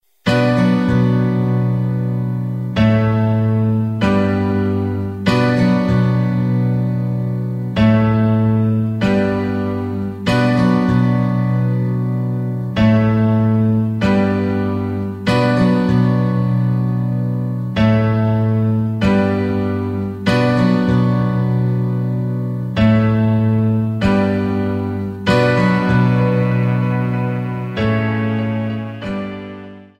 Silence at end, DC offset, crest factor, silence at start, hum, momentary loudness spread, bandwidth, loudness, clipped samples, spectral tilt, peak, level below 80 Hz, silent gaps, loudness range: 0.15 s; 0.1%; 14 dB; 0.25 s; none; 7 LU; 8.4 kHz; -16 LUFS; under 0.1%; -8.5 dB/octave; -2 dBFS; -40 dBFS; none; 1 LU